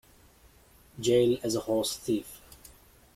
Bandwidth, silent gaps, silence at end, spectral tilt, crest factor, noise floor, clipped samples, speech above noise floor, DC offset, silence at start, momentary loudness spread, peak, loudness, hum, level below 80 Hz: 16 kHz; none; 0.8 s; -5 dB/octave; 18 dB; -58 dBFS; under 0.1%; 31 dB; under 0.1%; 0.95 s; 14 LU; -12 dBFS; -28 LUFS; none; -60 dBFS